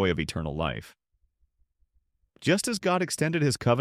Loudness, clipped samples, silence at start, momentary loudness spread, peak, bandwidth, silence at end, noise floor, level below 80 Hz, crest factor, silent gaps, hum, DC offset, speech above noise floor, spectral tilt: -27 LUFS; under 0.1%; 0 s; 7 LU; -10 dBFS; 15.5 kHz; 0 s; -71 dBFS; -50 dBFS; 18 dB; none; none; under 0.1%; 44 dB; -5 dB/octave